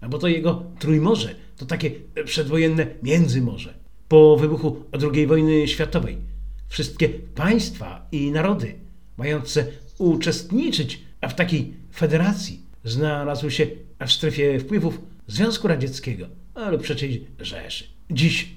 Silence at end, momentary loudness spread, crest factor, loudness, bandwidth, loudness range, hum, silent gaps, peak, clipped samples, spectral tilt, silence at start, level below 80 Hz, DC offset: 0 s; 14 LU; 20 dB; -22 LUFS; 15.5 kHz; 6 LU; none; none; -2 dBFS; under 0.1%; -6 dB/octave; 0 s; -42 dBFS; 0.8%